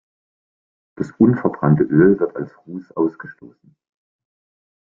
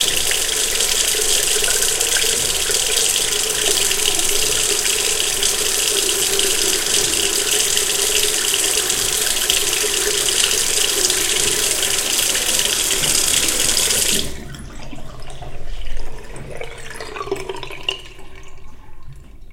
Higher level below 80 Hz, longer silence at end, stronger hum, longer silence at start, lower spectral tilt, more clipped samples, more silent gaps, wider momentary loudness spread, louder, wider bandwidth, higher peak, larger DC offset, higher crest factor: second, -56 dBFS vs -34 dBFS; first, 1.6 s vs 0 s; neither; first, 1 s vs 0 s; first, -11.5 dB/octave vs 0.5 dB/octave; neither; neither; about the same, 19 LU vs 19 LU; about the same, -17 LUFS vs -15 LUFS; second, 7 kHz vs 17 kHz; about the same, -2 dBFS vs 0 dBFS; neither; about the same, 18 dB vs 18 dB